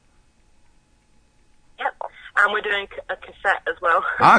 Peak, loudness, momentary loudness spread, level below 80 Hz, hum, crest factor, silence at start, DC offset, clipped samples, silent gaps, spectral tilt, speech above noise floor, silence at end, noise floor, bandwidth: 0 dBFS; -22 LUFS; 13 LU; -56 dBFS; none; 22 dB; 1.8 s; under 0.1%; under 0.1%; none; -4 dB/octave; 38 dB; 0 s; -58 dBFS; 10 kHz